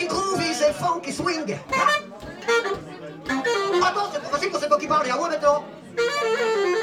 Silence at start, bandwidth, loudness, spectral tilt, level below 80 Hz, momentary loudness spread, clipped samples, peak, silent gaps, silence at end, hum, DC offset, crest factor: 0 s; 16.5 kHz; -23 LUFS; -3.5 dB/octave; -56 dBFS; 8 LU; under 0.1%; -6 dBFS; none; 0 s; none; under 0.1%; 18 dB